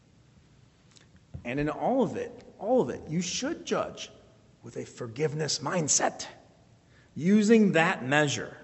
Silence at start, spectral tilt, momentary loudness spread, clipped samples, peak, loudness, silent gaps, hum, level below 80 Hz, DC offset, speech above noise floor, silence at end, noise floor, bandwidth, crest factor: 1.35 s; -4 dB/octave; 20 LU; under 0.1%; -8 dBFS; -27 LUFS; none; none; -60 dBFS; under 0.1%; 32 dB; 0 s; -59 dBFS; 8.2 kHz; 22 dB